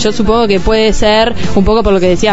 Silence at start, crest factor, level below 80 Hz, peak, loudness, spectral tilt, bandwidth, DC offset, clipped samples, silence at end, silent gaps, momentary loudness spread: 0 s; 10 dB; -20 dBFS; 0 dBFS; -10 LUFS; -5 dB/octave; 8 kHz; 10%; under 0.1%; 0 s; none; 2 LU